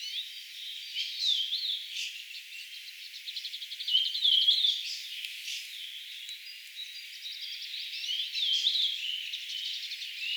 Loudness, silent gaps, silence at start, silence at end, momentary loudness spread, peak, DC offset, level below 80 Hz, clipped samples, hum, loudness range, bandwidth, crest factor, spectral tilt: -30 LUFS; none; 0 s; 0 s; 16 LU; -14 dBFS; under 0.1%; under -90 dBFS; under 0.1%; none; 8 LU; over 20 kHz; 20 dB; 11.5 dB/octave